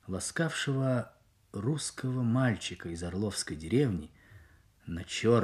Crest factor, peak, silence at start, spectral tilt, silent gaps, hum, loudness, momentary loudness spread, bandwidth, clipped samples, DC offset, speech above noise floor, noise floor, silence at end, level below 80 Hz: 18 dB; -14 dBFS; 0.05 s; -5.5 dB/octave; none; none; -32 LUFS; 13 LU; 13.5 kHz; under 0.1%; under 0.1%; 28 dB; -59 dBFS; 0 s; -56 dBFS